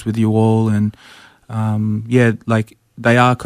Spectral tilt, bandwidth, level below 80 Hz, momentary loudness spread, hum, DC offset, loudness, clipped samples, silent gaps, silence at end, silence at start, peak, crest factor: -7.5 dB/octave; 11 kHz; -54 dBFS; 9 LU; none; under 0.1%; -16 LUFS; under 0.1%; none; 0 s; 0 s; -2 dBFS; 14 dB